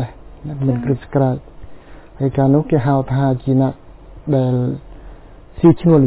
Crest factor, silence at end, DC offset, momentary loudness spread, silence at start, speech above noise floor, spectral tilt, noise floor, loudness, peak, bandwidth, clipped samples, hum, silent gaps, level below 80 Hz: 16 dB; 0 s; under 0.1%; 16 LU; 0 s; 23 dB; -13.5 dB/octave; -38 dBFS; -17 LUFS; -2 dBFS; 4 kHz; under 0.1%; none; none; -40 dBFS